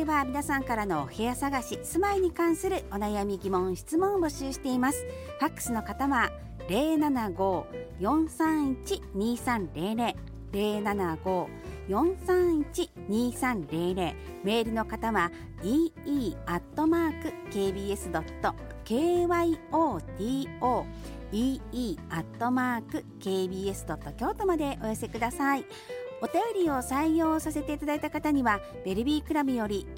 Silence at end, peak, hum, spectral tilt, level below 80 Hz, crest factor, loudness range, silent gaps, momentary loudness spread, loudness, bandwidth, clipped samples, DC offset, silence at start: 0 s; -12 dBFS; none; -5.5 dB/octave; -46 dBFS; 16 dB; 3 LU; none; 8 LU; -30 LUFS; 17 kHz; under 0.1%; under 0.1%; 0 s